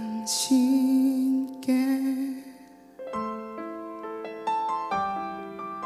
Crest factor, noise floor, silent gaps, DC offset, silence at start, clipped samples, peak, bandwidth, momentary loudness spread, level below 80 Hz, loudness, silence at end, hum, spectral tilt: 14 dB; -49 dBFS; none; under 0.1%; 0 s; under 0.1%; -12 dBFS; 15 kHz; 15 LU; -70 dBFS; -27 LUFS; 0 s; none; -3.5 dB/octave